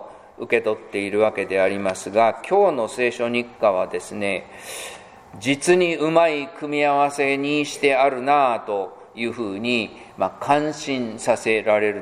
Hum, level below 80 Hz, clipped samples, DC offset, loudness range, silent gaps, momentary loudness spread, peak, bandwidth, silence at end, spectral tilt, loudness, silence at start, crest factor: none; -64 dBFS; under 0.1%; under 0.1%; 3 LU; none; 10 LU; -2 dBFS; 15 kHz; 0 s; -4.5 dB/octave; -21 LUFS; 0 s; 18 dB